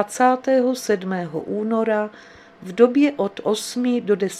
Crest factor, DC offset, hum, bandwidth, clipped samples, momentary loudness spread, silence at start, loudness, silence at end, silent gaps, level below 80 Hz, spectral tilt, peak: 20 dB; under 0.1%; none; 15 kHz; under 0.1%; 10 LU; 0 s; -21 LUFS; 0 s; none; -66 dBFS; -5 dB/octave; 0 dBFS